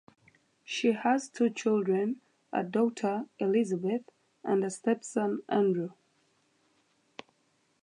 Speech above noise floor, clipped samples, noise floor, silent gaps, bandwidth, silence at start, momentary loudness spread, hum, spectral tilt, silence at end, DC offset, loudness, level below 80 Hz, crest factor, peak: 43 dB; under 0.1%; -72 dBFS; none; 11 kHz; 0.7 s; 13 LU; none; -5.5 dB/octave; 1.9 s; under 0.1%; -30 LUFS; -84 dBFS; 18 dB; -14 dBFS